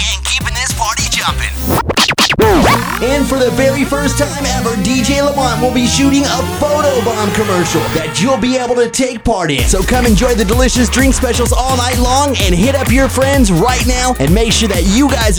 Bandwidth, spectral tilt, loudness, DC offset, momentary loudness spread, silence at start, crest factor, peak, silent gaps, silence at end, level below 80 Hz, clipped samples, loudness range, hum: over 20 kHz; -4 dB/octave; -12 LUFS; 0.4%; 4 LU; 0 s; 12 dB; 0 dBFS; none; 0 s; -20 dBFS; under 0.1%; 2 LU; none